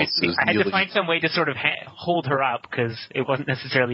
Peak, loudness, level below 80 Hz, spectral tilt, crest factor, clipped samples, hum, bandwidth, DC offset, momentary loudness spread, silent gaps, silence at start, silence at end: -4 dBFS; -22 LUFS; -58 dBFS; -8 dB/octave; 20 dB; under 0.1%; none; 7.2 kHz; under 0.1%; 7 LU; none; 0 s; 0 s